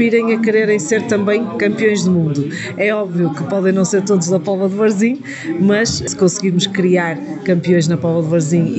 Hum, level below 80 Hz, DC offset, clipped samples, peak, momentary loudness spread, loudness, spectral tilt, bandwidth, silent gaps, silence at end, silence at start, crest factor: none; -52 dBFS; under 0.1%; under 0.1%; -2 dBFS; 4 LU; -15 LUFS; -5.5 dB/octave; 8.4 kHz; none; 0 s; 0 s; 12 dB